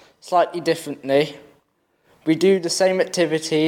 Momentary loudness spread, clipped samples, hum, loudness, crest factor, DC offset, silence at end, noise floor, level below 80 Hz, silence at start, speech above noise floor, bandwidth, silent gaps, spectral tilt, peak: 7 LU; under 0.1%; none; -20 LUFS; 16 dB; under 0.1%; 0 s; -65 dBFS; -70 dBFS; 0.25 s; 46 dB; 16.5 kHz; none; -4.5 dB/octave; -6 dBFS